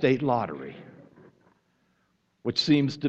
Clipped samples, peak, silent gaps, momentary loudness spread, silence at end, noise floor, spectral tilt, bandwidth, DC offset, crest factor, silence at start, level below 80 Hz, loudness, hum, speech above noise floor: under 0.1%; -10 dBFS; none; 19 LU; 0 s; -71 dBFS; -6 dB/octave; 8 kHz; under 0.1%; 18 dB; 0 s; -66 dBFS; -26 LUFS; none; 46 dB